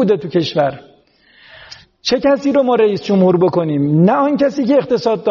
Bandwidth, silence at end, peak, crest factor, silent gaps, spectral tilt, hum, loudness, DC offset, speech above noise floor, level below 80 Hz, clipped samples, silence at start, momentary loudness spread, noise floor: 7.2 kHz; 0 s; -2 dBFS; 12 dB; none; -6 dB/octave; none; -14 LUFS; under 0.1%; 37 dB; -54 dBFS; under 0.1%; 0 s; 5 LU; -50 dBFS